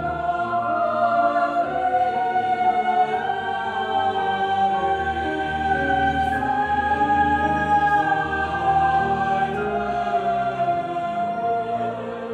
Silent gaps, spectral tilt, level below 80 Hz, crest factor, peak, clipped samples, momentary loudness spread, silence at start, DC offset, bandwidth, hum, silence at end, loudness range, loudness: none; -6 dB/octave; -44 dBFS; 12 dB; -8 dBFS; under 0.1%; 5 LU; 0 s; under 0.1%; 9.6 kHz; none; 0 s; 2 LU; -22 LUFS